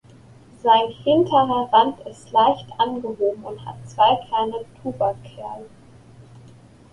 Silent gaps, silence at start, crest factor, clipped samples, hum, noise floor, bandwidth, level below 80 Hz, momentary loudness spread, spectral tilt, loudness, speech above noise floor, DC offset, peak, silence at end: none; 0.65 s; 20 dB; under 0.1%; none; -47 dBFS; 11 kHz; -58 dBFS; 18 LU; -6 dB/octave; -20 LUFS; 27 dB; under 0.1%; -2 dBFS; 1.25 s